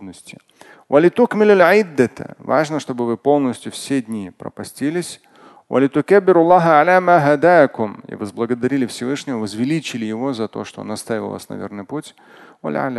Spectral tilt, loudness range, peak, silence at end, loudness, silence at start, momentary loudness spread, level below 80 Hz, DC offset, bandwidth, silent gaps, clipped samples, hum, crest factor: -6 dB/octave; 10 LU; 0 dBFS; 0 s; -16 LUFS; 0 s; 18 LU; -62 dBFS; under 0.1%; 12.5 kHz; none; under 0.1%; none; 18 dB